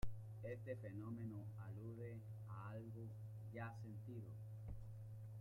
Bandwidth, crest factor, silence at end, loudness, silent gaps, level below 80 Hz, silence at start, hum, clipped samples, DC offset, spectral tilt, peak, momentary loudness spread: 14.5 kHz; 18 dB; 0 s; -53 LUFS; none; -64 dBFS; 0 s; none; under 0.1%; under 0.1%; -8.5 dB/octave; -32 dBFS; 4 LU